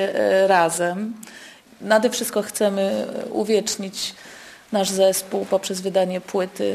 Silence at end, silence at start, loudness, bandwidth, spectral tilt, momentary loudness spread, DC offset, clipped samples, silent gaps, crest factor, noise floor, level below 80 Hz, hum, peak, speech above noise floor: 0 s; 0 s; -21 LUFS; 14 kHz; -3.5 dB/octave; 18 LU; under 0.1%; under 0.1%; none; 18 dB; -44 dBFS; -66 dBFS; none; -4 dBFS; 23 dB